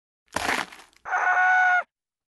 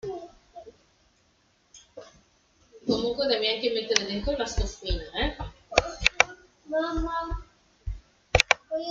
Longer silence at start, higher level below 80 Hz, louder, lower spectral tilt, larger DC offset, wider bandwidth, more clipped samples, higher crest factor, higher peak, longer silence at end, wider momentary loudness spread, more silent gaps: first, 0.35 s vs 0.05 s; second, -60 dBFS vs -40 dBFS; first, -22 LUFS vs -27 LUFS; second, -1.5 dB/octave vs -3 dB/octave; neither; first, 12.5 kHz vs 11 kHz; neither; second, 16 dB vs 30 dB; second, -8 dBFS vs 0 dBFS; first, 0.5 s vs 0 s; second, 20 LU vs 24 LU; neither